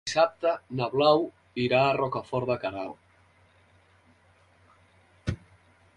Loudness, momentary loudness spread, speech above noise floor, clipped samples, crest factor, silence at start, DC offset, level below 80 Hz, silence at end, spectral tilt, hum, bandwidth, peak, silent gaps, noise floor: -27 LUFS; 14 LU; 36 dB; under 0.1%; 22 dB; 0.05 s; under 0.1%; -54 dBFS; 0.6 s; -5.5 dB/octave; none; 11 kHz; -8 dBFS; none; -61 dBFS